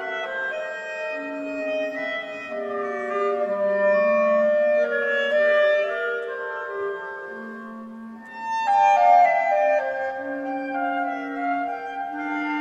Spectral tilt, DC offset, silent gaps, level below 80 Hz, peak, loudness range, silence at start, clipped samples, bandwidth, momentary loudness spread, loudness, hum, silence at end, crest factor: -4.5 dB/octave; under 0.1%; none; -74 dBFS; -6 dBFS; 6 LU; 0 s; under 0.1%; 8 kHz; 14 LU; -23 LUFS; none; 0 s; 16 dB